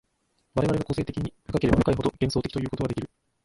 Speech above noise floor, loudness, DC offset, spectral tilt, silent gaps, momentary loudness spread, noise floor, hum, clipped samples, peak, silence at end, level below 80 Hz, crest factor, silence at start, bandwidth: 46 dB; -27 LUFS; under 0.1%; -7.5 dB/octave; none; 10 LU; -72 dBFS; none; under 0.1%; -4 dBFS; 0.4 s; -42 dBFS; 22 dB; 0.55 s; 11.5 kHz